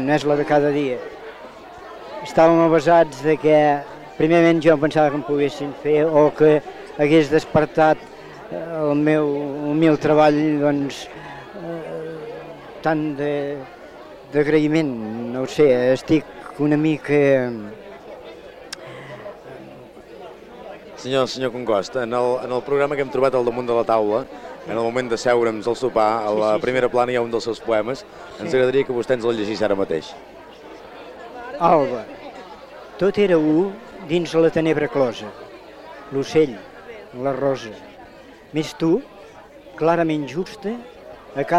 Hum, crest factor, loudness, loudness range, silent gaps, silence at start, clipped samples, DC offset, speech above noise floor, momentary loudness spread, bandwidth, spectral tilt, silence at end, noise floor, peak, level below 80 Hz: none; 18 dB; -19 LUFS; 8 LU; none; 0 s; under 0.1%; under 0.1%; 24 dB; 23 LU; 12 kHz; -6.5 dB/octave; 0 s; -43 dBFS; -4 dBFS; -54 dBFS